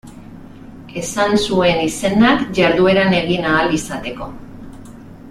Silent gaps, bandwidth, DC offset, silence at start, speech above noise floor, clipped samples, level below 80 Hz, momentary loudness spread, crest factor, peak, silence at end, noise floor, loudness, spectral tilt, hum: none; 15 kHz; under 0.1%; 0.05 s; 21 dB; under 0.1%; -42 dBFS; 19 LU; 16 dB; -2 dBFS; 0 s; -36 dBFS; -15 LUFS; -5 dB/octave; none